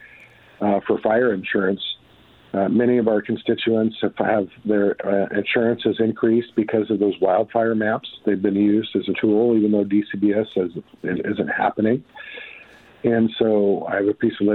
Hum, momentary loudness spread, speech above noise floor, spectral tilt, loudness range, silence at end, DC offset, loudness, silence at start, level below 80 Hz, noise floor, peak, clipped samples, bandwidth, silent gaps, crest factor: none; 8 LU; 32 dB; -9.5 dB/octave; 3 LU; 0 s; under 0.1%; -21 LUFS; 0.6 s; -60 dBFS; -51 dBFS; -4 dBFS; under 0.1%; 4.3 kHz; none; 18 dB